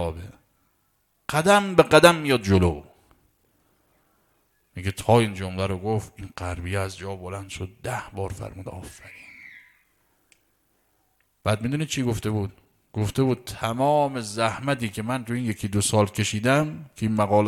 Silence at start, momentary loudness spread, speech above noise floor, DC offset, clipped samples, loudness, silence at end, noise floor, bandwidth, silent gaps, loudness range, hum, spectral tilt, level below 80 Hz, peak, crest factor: 0 s; 20 LU; 46 dB; under 0.1%; under 0.1%; -24 LUFS; 0 s; -69 dBFS; 16 kHz; none; 15 LU; none; -5 dB/octave; -48 dBFS; 0 dBFS; 24 dB